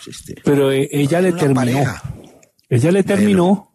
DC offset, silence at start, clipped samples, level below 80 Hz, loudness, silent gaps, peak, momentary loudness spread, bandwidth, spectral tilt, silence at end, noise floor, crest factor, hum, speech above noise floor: under 0.1%; 0 s; under 0.1%; -50 dBFS; -16 LUFS; none; -2 dBFS; 9 LU; 13.5 kHz; -6.5 dB/octave; 0.15 s; -46 dBFS; 14 dB; none; 31 dB